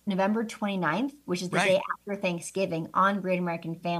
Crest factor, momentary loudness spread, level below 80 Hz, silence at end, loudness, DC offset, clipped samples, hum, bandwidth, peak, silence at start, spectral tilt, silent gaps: 18 dB; 7 LU; -72 dBFS; 0 s; -28 LUFS; under 0.1%; under 0.1%; none; 15 kHz; -10 dBFS; 0.05 s; -5.5 dB/octave; none